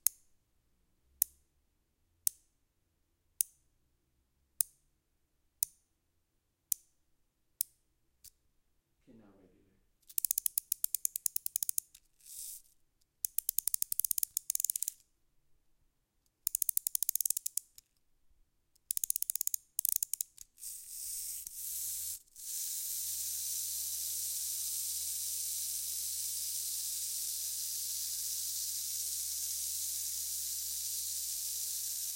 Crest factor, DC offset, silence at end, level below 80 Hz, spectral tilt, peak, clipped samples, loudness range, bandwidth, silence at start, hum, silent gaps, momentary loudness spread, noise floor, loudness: 34 dB; under 0.1%; 0 s; -74 dBFS; 3 dB/octave; -6 dBFS; under 0.1%; 7 LU; 17 kHz; 0.05 s; none; none; 7 LU; -80 dBFS; -35 LUFS